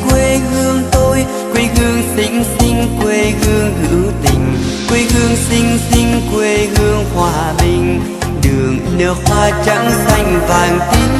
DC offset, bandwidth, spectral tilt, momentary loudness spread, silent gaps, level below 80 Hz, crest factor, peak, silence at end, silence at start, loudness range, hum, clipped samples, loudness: under 0.1%; 14 kHz; -5 dB/octave; 3 LU; none; -22 dBFS; 12 dB; 0 dBFS; 0 s; 0 s; 1 LU; none; under 0.1%; -13 LUFS